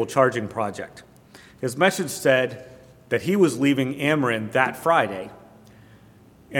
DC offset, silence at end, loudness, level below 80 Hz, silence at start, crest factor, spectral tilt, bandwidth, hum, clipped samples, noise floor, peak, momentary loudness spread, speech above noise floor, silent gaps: under 0.1%; 0 s; -22 LUFS; -64 dBFS; 0 s; 22 dB; -5 dB/octave; 18 kHz; none; under 0.1%; -51 dBFS; -2 dBFS; 13 LU; 29 dB; none